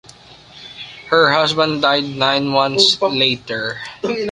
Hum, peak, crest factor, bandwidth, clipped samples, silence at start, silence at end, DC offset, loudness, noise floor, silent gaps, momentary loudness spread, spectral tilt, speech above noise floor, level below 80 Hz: none; 0 dBFS; 16 dB; 11.5 kHz; under 0.1%; 0.55 s; 0 s; under 0.1%; -15 LUFS; -42 dBFS; none; 16 LU; -3.5 dB/octave; 26 dB; -56 dBFS